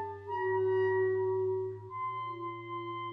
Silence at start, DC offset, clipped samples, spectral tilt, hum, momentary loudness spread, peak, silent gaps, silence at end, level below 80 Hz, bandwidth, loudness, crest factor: 0 s; under 0.1%; under 0.1%; -9 dB/octave; none; 10 LU; -22 dBFS; none; 0 s; -76 dBFS; 4 kHz; -33 LUFS; 12 dB